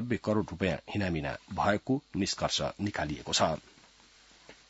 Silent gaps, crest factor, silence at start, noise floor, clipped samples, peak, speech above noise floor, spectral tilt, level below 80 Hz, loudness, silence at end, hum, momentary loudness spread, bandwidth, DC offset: none; 22 dB; 0 s; -59 dBFS; under 0.1%; -10 dBFS; 28 dB; -4.5 dB/octave; -56 dBFS; -31 LUFS; 0.15 s; none; 6 LU; 8 kHz; under 0.1%